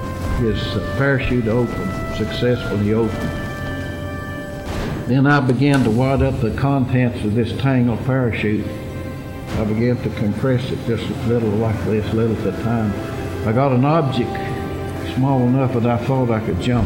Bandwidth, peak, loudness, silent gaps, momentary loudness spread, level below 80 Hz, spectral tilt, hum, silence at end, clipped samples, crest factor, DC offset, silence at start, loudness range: 16.5 kHz; -6 dBFS; -19 LUFS; none; 10 LU; -34 dBFS; -7.5 dB/octave; none; 0 s; under 0.1%; 12 dB; under 0.1%; 0 s; 4 LU